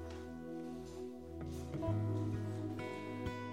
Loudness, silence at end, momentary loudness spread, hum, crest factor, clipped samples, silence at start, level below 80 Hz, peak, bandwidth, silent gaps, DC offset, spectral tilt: -43 LUFS; 0 s; 10 LU; none; 16 dB; under 0.1%; 0 s; -60 dBFS; -26 dBFS; 13.5 kHz; none; under 0.1%; -7.5 dB/octave